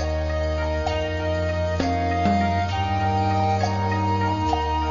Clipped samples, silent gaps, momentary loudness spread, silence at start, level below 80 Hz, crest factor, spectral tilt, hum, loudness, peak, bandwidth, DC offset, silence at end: under 0.1%; none; 4 LU; 0 s; -34 dBFS; 14 dB; -6.5 dB/octave; none; -23 LUFS; -8 dBFS; 7.4 kHz; 0.4%; 0 s